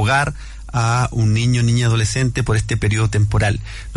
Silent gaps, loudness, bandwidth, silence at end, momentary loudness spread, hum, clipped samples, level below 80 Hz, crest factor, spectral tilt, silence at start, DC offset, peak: none; -18 LUFS; 11.5 kHz; 0 s; 6 LU; none; under 0.1%; -32 dBFS; 10 dB; -5.5 dB/octave; 0 s; under 0.1%; -6 dBFS